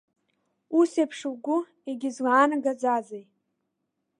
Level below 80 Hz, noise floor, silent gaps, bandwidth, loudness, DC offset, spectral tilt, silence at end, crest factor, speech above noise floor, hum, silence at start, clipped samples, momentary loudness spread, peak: -84 dBFS; -80 dBFS; none; 11 kHz; -25 LUFS; under 0.1%; -4 dB/octave; 1 s; 20 dB; 54 dB; none; 0.7 s; under 0.1%; 13 LU; -8 dBFS